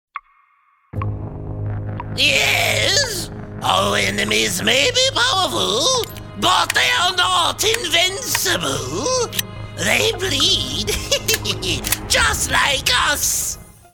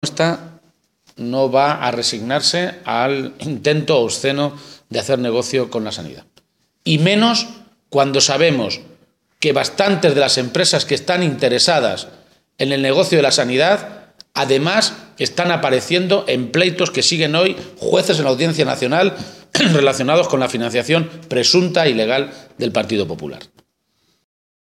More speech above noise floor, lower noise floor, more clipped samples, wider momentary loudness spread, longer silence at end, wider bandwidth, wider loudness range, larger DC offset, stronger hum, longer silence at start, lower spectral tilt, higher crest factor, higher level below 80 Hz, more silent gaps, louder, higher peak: second, 40 dB vs 48 dB; second, -58 dBFS vs -65 dBFS; neither; about the same, 12 LU vs 11 LU; second, 0.25 s vs 1.15 s; first, over 20 kHz vs 14.5 kHz; about the same, 3 LU vs 3 LU; neither; neither; about the same, 0.15 s vs 0.05 s; second, -2 dB/octave vs -4 dB/octave; about the same, 16 dB vs 18 dB; first, -38 dBFS vs -62 dBFS; neither; about the same, -17 LUFS vs -16 LUFS; about the same, -2 dBFS vs 0 dBFS